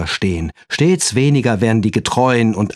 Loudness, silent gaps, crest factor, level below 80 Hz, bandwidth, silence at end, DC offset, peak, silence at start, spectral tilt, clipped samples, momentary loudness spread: -15 LUFS; none; 14 dB; -38 dBFS; 13 kHz; 0.05 s; under 0.1%; -2 dBFS; 0 s; -5 dB/octave; under 0.1%; 6 LU